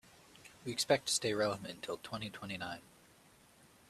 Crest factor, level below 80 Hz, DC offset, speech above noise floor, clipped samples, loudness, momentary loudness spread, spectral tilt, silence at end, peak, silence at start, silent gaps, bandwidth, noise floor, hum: 24 dB; -72 dBFS; under 0.1%; 27 dB; under 0.1%; -37 LUFS; 17 LU; -3 dB/octave; 1.1 s; -16 dBFS; 0.35 s; none; 15 kHz; -64 dBFS; none